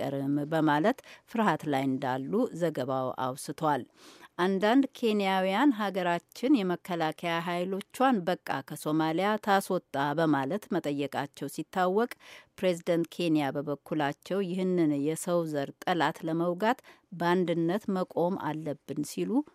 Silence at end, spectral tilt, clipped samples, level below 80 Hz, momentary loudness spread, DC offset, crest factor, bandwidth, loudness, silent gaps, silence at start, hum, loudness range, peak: 0.1 s; -6 dB/octave; under 0.1%; -78 dBFS; 8 LU; under 0.1%; 20 dB; 16 kHz; -30 LUFS; none; 0 s; none; 3 LU; -10 dBFS